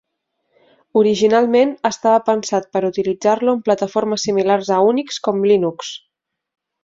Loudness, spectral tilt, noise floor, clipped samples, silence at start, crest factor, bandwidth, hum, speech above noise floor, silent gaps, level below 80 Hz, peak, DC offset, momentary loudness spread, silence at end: -17 LUFS; -5 dB/octave; -72 dBFS; under 0.1%; 0.95 s; 16 dB; 7.8 kHz; none; 56 dB; none; -62 dBFS; -2 dBFS; under 0.1%; 7 LU; 0.85 s